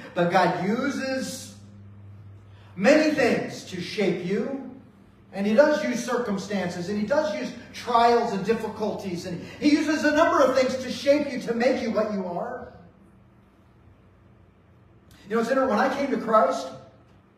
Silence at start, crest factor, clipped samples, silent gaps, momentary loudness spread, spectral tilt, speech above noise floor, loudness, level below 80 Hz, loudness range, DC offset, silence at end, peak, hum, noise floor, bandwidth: 0 s; 20 dB; under 0.1%; none; 14 LU; -5.5 dB/octave; 32 dB; -24 LUFS; -62 dBFS; 7 LU; under 0.1%; 0.55 s; -4 dBFS; none; -55 dBFS; 15.5 kHz